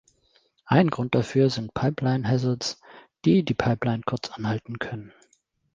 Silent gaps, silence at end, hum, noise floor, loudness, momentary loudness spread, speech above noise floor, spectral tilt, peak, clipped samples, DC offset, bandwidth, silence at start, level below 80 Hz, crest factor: none; 0.65 s; none; -67 dBFS; -25 LUFS; 11 LU; 43 dB; -6.5 dB/octave; -4 dBFS; under 0.1%; under 0.1%; 7.6 kHz; 0.65 s; -56 dBFS; 20 dB